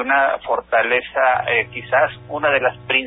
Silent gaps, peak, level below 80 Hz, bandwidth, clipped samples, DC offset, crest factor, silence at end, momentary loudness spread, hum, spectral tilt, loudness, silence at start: none; -4 dBFS; -52 dBFS; 4 kHz; under 0.1%; under 0.1%; 16 dB; 0 s; 4 LU; none; -9 dB/octave; -18 LUFS; 0 s